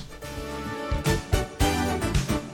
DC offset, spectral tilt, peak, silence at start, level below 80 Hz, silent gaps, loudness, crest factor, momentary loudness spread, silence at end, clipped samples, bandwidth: under 0.1%; -5 dB/octave; -8 dBFS; 0 s; -32 dBFS; none; -27 LUFS; 18 dB; 10 LU; 0 s; under 0.1%; 17.5 kHz